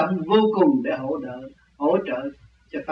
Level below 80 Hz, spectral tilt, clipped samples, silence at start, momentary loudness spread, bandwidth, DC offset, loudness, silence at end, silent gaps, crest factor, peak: -60 dBFS; -9 dB/octave; under 0.1%; 0 s; 17 LU; 5.8 kHz; under 0.1%; -22 LUFS; 0 s; none; 16 dB; -6 dBFS